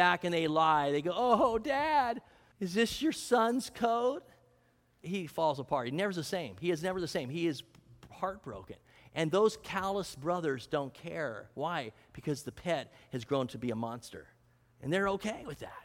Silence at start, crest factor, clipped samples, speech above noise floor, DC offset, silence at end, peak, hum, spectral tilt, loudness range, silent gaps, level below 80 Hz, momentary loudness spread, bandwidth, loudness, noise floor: 0 s; 20 dB; under 0.1%; 36 dB; under 0.1%; 0 s; -12 dBFS; none; -5 dB/octave; 7 LU; none; -64 dBFS; 15 LU; 17 kHz; -33 LUFS; -69 dBFS